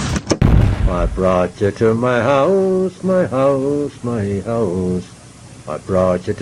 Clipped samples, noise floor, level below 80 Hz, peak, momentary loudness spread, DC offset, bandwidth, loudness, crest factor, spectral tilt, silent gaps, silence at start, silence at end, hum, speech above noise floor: under 0.1%; -38 dBFS; -26 dBFS; 0 dBFS; 8 LU; under 0.1%; 11.5 kHz; -17 LUFS; 16 dB; -7 dB/octave; none; 0 s; 0 s; none; 22 dB